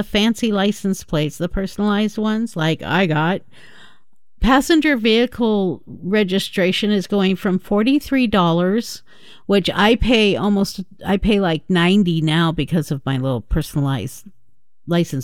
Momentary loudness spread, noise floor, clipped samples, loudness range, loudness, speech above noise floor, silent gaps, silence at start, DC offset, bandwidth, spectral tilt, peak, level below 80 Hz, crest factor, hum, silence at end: 8 LU; -68 dBFS; under 0.1%; 3 LU; -18 LUFS; 50 dB; none; 0 s; 0.8%; 16 kHz; -6 dB/octave; -2 dBFS; -34 dBFS; 16 dB; none; 0 s